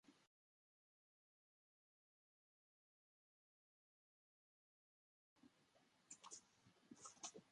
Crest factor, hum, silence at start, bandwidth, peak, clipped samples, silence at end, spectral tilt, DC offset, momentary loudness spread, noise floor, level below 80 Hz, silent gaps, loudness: 30 dB; none; 0.05 s; 11 kHz; -40 dBFS; under 0.1%; 0 s; -1.5 dB/octave; under 0.1%; 8 LU; under -90 dBFS; under -90 dBFS; 0.27-5.36 s; -60 LUFS